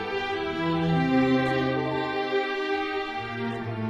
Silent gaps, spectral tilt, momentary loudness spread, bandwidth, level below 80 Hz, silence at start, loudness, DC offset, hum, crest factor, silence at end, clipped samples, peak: none; -7 dB/octave; 9 LU; 10.5 kHz; -54 dBFS; 0 s; -26 LUFS; under 0.1%; none; 14 dB; 0 s; under 0.1%; -12 dBFS